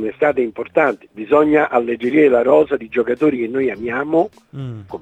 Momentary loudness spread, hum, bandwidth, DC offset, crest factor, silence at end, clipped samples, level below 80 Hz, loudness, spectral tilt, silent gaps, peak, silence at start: 13 LU; none; 8 kHz; under 0.1%; 16 dB; 0.05 s; under 0.1%; -56 dBFS; -16 LUFS; -8 dB/octave; none; 0 dBFS; 0 s